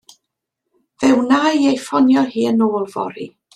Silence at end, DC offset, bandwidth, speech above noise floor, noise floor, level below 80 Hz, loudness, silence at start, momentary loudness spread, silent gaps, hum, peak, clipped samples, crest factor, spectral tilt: 0.3 s; under 0.1%; 11.5 kHz; 62 dB; -78 dBFS; -62 dBFS; -16 LUFS; 1 s; 11 LU; none; none; -2 dBFS; under 0.1%; 14 dB; -5 dB/octave